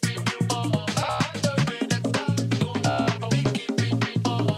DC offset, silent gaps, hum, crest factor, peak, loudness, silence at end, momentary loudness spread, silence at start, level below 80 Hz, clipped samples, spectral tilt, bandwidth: under 0.1%; none; none; 12 dB; -12 dBFS; -25 LUFS; 0 s; 2 LU; 0 s; -56 dBFS; under 0.1%; -5.5 dB/octave; 15 kHz